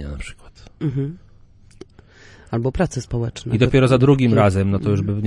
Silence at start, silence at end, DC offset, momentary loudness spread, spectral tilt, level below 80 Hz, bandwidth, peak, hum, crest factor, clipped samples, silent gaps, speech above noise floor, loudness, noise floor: 0 s; 0 s; under 0.1%; 14 LU; -7.5 dB/octave; -38 dBFS; 11 kHz; -2 dBFS; none; 18 dB; under 0.1%; none; 29 dB; -19 LUFS; -47 dBFS